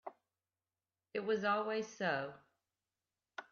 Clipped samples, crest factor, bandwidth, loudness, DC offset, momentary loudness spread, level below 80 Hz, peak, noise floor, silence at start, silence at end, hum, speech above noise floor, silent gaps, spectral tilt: under 0.1%; 18 dB; 7.2 kHz; -38 LUFS; under 0.1%; 18 LU; -88 dBFS; -24 dBFS; under -90 dBFS; 0.05 s; 0.1 s; none; over 53 dB; none; -3 dB/octave